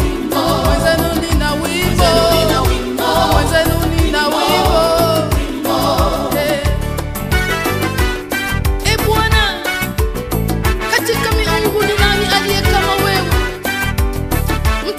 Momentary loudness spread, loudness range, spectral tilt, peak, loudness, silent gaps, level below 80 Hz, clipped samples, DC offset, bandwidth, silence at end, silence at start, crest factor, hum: 6 LU; 3 LU; -4.5 dB/octave; 0 dBFS; -15 LUFS; none; -22 dBFS; under 0.1%; under 0.1%; 15.5 kHz; 0 s; 0 s; 14 dB; none